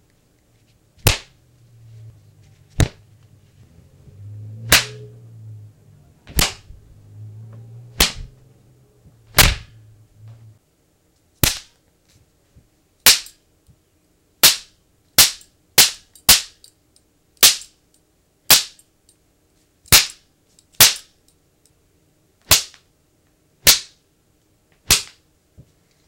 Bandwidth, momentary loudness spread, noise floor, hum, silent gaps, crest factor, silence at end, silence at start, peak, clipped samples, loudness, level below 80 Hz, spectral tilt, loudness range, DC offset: 16.5 kHz; 22 LU; -62 dBFS; none; none; 22 dB; 1.05 s; 1.05 s; 0 dBFS; under 0.1%; -15 LUFS; -36 dBFS; -0.5 dB/octave; 11 LU; under 0.1%